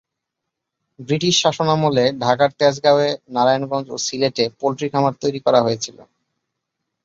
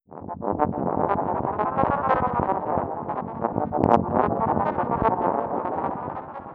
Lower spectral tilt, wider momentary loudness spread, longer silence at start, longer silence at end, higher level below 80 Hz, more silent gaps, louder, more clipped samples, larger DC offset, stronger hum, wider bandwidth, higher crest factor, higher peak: second, -4.5 dB/octave vs -10 dB/octave; about the same, 7 LU vs 9 LU; first, 1 s vs 0.1 s; first, 1 s vs 0 s; second, -60 dBFS vs -48 dBFS; neither; first, -18 LUFS vs -24 LUFS; neither; neither; neither; first, 7.8 kHz vs 6.4 kHz; second, 18 dB vs 24 dB; about the same, -2 dBFS vs 0 dBFS